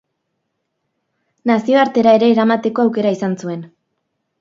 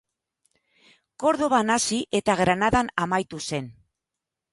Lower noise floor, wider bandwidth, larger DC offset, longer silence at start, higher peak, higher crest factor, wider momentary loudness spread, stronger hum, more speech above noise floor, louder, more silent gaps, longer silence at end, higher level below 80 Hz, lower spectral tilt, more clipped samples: second, -73 dBFS vs -86 dBFS; second, 7.6 kHz vs 11.5 kHz; neither; first, 1.45 s vs 1.2 s; first, 0 dBFS vs -6 dBFS; about the same, 16 dB vs 20 dB; first, 13 LU vs 10 LU; neither; second, 58 dB vs 63 dB; first, -15 LUFS vs -23 LUFS; neither; about the same, 0.75 s vs 0.8 s; second, -66 dBFS vs -50 dBFS; first, -6.5 dB/octave vs -4 dB/octave; neither